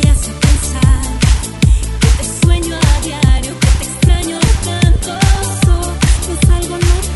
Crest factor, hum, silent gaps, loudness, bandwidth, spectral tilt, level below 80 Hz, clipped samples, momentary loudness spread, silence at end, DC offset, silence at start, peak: 12 dB; none; none; -13 LUFS; 12 kHz; -5 dB/octave; -14 dBFS; under 0.1%; 1 LU; 0 s; under 0.1%; 0 s; 0 dBFS